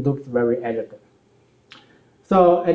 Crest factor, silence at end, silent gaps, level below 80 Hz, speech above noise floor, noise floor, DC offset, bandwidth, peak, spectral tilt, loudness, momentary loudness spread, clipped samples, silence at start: 18 dB; 0 s; none; -56 dBFS; 39 dB; -58 dBFS; under 0.1%; 7.4 kHz; -2 dBFS; -9.5 dB/octave; -20 LUFS; 14 LU; under 0.1%; 0 s